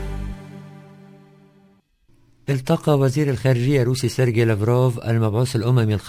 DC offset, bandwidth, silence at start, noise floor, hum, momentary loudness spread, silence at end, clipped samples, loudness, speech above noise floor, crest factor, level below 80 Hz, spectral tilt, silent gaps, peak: under 0.1%; 16 kHz; 0 s; -57 dBFS; none; 16 LU; 0 s; under 0.1%; -20 LUFS; 39 dB; 16 dB; -40 dBFS; -7 dB/octave; none; -4 dBFS